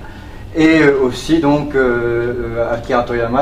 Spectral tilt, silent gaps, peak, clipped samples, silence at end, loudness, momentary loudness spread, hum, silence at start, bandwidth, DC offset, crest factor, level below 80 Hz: -6.5 dB/octave; none; 0 dBFS; under 0.1%; 0 s; -15 LUFS; 9 LU; none; 0 s; 11.5 kHz; under 0.1%; 14 dB; -32 dBFS